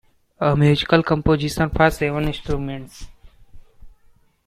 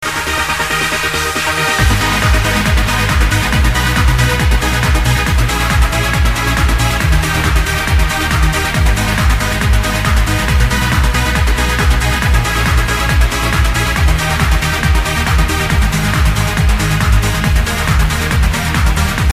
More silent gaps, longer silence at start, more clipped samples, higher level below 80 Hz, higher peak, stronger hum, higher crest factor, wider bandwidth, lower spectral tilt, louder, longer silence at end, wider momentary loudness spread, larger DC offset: neither; first, 0.4 s vs 0 s; neither; second, -36 dBFS vs -16 dBFS; about the same, -2 dBFS vs 0 dBFS; neither; first, 20 dB vs 12 dB; about the same, 14.5 kHz vs 15.5 kHz; first, -6.5 dB/octave vs -4 dB/octave; second, -19 LUFS vs -13 LUFS; first, 0.55 s vs 0 s; first, 11 LU vs 2 LU; neither